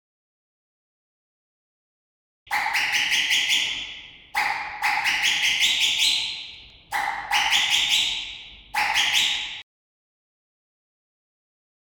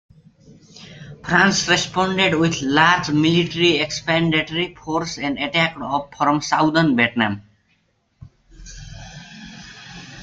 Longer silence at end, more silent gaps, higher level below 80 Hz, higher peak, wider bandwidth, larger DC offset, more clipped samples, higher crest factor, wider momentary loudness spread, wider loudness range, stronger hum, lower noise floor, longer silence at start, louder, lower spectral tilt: first, 2.2 s vs 0 s; neither; second, -60 dBFS vs -50 dBFS; second, -6 dBFS vs -2 dBFS; first, 19.5 kHz vs 9 kHz; neither; neither; about the same, 20 dB vs 20 dB; second, 14 LU vs 22 LU; about the same, 5 LU vs 5 LU; neither; second, -43 dBFS vs -64 dBFS; first, 2.45 s vs 0.75 s; second, -21 LUFS vs -18 LUFS; second, 2 dB/octave vs -4 dB/octave